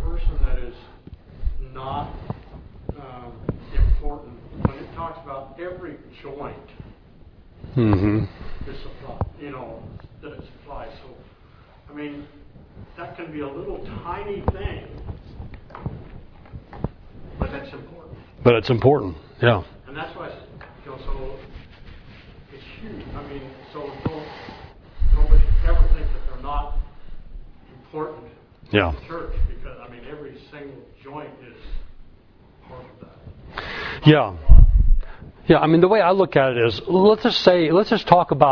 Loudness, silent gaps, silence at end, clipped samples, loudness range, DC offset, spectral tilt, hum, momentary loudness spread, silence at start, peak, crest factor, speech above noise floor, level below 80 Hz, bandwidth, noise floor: -21 LUFS; none; 0 s; under 0.1%; 20 LU; under 0.1%; -8 dB/octave; none; 25 LU; 0 s; 0 dBFS; 22 dB; 30 dB; -24 dBFS; 5.4 kHz; -50 dBFS